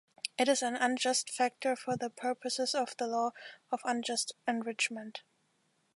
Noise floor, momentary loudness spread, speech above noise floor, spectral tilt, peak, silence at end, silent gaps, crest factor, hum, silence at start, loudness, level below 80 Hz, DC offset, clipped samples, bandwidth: -75 dBFS; 10 LU; 41 dB; -2 dB/octave; -14 dBFS; 0.8 s; none; 20 dB; none; 0.25 s; -33 LUFS; -86 dBFS; under 0.1%; under 0.1%; 11.5 kHz